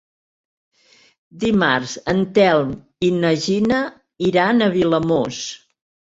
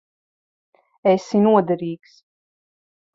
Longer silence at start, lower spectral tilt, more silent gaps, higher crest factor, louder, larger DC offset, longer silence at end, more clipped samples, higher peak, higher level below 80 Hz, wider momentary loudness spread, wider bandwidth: first, 1.35 s vs 1.05 s; second, -5.5 dB/octave vs -7.5 dB/octave; neither; about the same, 18 dB vs 18 dB; about the same, -18 LUFS vs -19 LUFS; neither; second, 0.45 s vs 1.2 s; neither; about the same, -2 dBFS vs -4 dBFS; first, -52 dBFS vs -66 dBFS; about the same, 11 LU vs 13 LU; about the same, 8 kHz vs 7.6 kHz